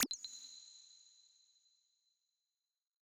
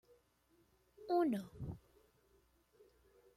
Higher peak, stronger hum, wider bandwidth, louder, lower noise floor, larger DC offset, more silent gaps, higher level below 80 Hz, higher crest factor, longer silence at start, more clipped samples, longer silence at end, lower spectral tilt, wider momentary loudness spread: first, -18 dBFS vs -24 dBFS; neither; first, over 20 kHz vs 14.5 kHz; second, -45 LUFS vs -40 LUFS; first, under -90 dBFS vs -75 dBFS; neither; neither; second, under -90 dBFS vs -68 dBFS; first, 32 dB vs 20 dB; second, 0 s vs 1 s; neither; first, 1.95 s vs 1.6 s; second, 0 dB/octave vs -8 dB/octave; first, 23 LU vs 20 LU